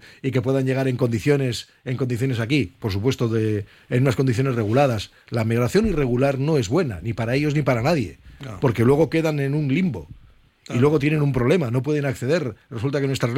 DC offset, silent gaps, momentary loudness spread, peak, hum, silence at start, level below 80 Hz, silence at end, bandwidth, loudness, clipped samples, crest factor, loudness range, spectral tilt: under 0.1%; none; 8 LU; -6 dBFS; none; 0.25 s; -44 dBFS; 0 s; 15.5 kHz; -22 LUFS; under 0.1%; 16 dB; 2 LU; -7 dB/octave